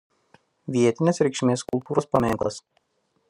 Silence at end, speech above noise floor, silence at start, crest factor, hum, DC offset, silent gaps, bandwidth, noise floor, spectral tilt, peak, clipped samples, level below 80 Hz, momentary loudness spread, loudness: 0.7 s; 38 dB; 0.7 s; 20 dB; none; under 0.1%; none; 13.5 kHz; -61 dBFS; -6 dB/octave; -6 dBFS; under 0.1%; -56 dBFS; 9 LU; -24 LUFS